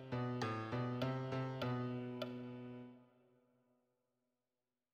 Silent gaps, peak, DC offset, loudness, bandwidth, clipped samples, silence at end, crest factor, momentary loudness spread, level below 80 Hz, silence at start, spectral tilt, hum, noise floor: none; -28 dBFS; under 0.1%; -43 LUFS; 13 kHz; under 0.1%; 1.9 s; 18 dB; 11 LU; -76 dBFS; 0 s; -7.5 dB/octave; none; under -90 dBFS